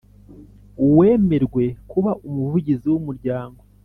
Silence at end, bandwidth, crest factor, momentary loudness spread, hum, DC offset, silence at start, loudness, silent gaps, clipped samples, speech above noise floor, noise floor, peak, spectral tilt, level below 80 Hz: 0.35 s; 4 kHz; 16 dB; 12 LU; 50 Hz at -40 dBFS; under 0.1%; 0.3 s; -19 LUFS; none; under 0.1%; 26 dB; -44 dBFS; -4 dBFS; -11.5 dB/octave; -46 dBFS